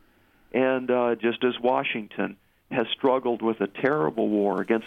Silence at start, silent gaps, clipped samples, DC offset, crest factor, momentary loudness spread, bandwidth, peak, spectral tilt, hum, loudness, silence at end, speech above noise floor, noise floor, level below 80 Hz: 0.55 s; none; under 0.1%; under 0.1%; 16 dB; 7 LU; 4.9 kHz; -10 dBFS; -7.5 dB/octave; none; -25 LUFS; 0 s; 35 dB; -60 dBFS; -68 dBFS